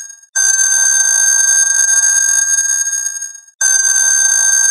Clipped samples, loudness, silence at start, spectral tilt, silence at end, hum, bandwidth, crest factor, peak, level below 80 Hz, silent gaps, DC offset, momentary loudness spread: under 0.1%; -9 LUFS; 0 s; 12 dB/octave; 0 s; none; 13 kHz; 12 dB; 0 dBFS; under -90 dBFS; 0.29-0.33 s, 3.55-3.59 s; under 0.1%; 8 LU